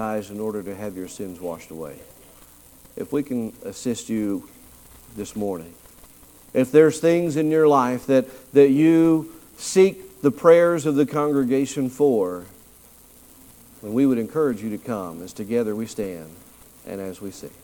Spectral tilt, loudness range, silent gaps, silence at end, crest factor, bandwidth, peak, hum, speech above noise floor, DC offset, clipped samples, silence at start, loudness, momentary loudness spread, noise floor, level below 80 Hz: -6 dB/octave; 12 LU; none; 0.15 s; 20 dB; 19 kHz; -2 dBFS; 60 Hz at -60 dBFS; 29 dB; under 0.1%; under 0.1%; 0 s; -21 LUFS; 19 LU; -50 dBFS; -58 dBFS